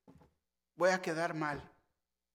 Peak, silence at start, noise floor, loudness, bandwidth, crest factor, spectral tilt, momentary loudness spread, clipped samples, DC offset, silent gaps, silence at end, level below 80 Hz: -16 dBFS; 0.8 s; -86 dBFS; -35 LUFS; 15.5 kHz; 20 dB; -5 dB/octave; 8 LU; under 0.1%; under 0.1%; none; 0.65 s; -70 dBFS